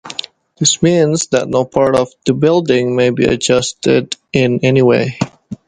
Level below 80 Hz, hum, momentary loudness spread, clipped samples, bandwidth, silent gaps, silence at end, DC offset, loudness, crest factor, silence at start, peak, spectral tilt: -46 dBFS; none; 7 LU; under 0.1%; 11 kHz; none; 0.1 s; under 0.1%; -14 LUFS; 14 dB; 0.05 s; 0 dBFS; -4.5 dB/octave